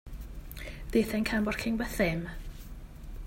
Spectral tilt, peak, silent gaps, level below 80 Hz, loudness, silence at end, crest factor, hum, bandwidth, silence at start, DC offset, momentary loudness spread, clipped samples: -5.5 dB/octave; -12 dBFS; none; -42 dBFS; -30 LUFS; 0 s; 20 dB; none; 16.5 kHz; 0.05 s; under 0.1%; 19 LU; under 0.1%